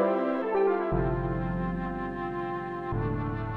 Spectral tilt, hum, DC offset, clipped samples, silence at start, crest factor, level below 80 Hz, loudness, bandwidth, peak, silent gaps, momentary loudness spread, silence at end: -10 dB/octave; none; under 0.1%; under 0.1%; 0 s; 16 dB; -42 dBFS; -30 LUFS; 5.2 kHz; -14 dBFS; none; 7 LU; 0 s